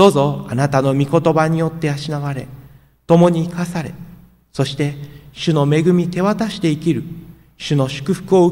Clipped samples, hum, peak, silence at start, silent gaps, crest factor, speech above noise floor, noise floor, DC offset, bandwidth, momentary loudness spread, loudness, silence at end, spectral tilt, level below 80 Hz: under 0.1%; none; 0 dBFS; 0 s; none; 16 dB; 28 dB; -44 dBFS; under 0.1%; 16 kHz; 17 LU; -17 LUFS; 0 s; -7 dB/octave; -48 dBFS